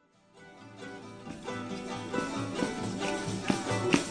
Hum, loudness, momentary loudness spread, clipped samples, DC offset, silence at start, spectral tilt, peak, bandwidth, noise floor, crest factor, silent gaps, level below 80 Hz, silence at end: none; -33 LUFS; 16 LU; under 0.1%; under 0.1%; 0.35 s; -4.5 dB/octave; -8 dBFS; 10 kHz; -57 dBFS; 28 dB; none; -60 dBFS; 0 s